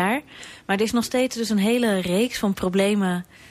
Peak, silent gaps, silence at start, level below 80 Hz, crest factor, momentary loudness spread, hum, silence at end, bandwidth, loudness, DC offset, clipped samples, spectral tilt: -10 dBFS; none; 0 s; -54 dBFS; 14 dB; 7 LU; none; 0.05 s; 15.5 kHz; -22 LUFS; under 0.1%; under 0.1%; -5 dB/octave